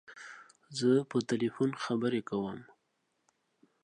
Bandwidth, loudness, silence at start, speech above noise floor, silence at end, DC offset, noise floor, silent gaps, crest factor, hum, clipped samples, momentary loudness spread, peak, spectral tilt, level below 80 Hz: 10.5 kHz; -32 LUFS; 0.1 s; 48 dB; 1.2 s; under 0.1%; -79 dBFS; none; 18 dB; none; under 0.1%; 20 LU; -16 dBFS; -6 dB/octave; -76 dBFS